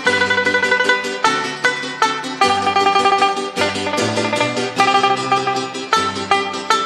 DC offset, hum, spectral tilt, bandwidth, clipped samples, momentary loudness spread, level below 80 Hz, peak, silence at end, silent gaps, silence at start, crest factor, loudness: under 0.1%; none; -2.5 dB/octave; 13 kHz; under 0.1%; 5 LU; -64 dBFS; -2 dBFS; 0 s; none; 0 s; 16 dB; -16 LUFS